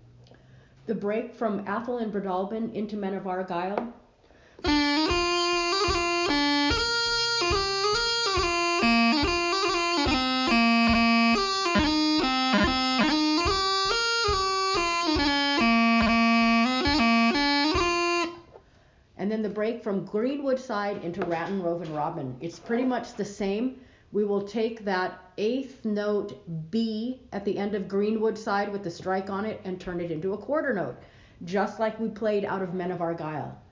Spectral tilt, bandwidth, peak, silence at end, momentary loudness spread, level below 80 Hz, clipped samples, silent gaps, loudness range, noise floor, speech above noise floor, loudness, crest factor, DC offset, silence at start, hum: -4 dB/octave; 7.6 kHz; -10 dBFS; 0.1 s; 11 LU; -46 dBFS; under 0.1%; none; 8 LU; -58 dBFS; 29 dB; -25 LUFS; 16 dB; under 0.1%; 0.85 s; none